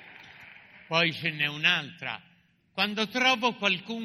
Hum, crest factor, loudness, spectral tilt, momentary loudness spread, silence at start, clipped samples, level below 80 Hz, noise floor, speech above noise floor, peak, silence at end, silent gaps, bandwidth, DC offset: none; 22 dB; -26 LUFS; -3.5 dB/octave; 17 LU; 0 s; under 0.1%; -72 dBFS; -51 dBFS; 23 dB; -8 dBFS; 0 s; none; 15 kHz; under 0.1%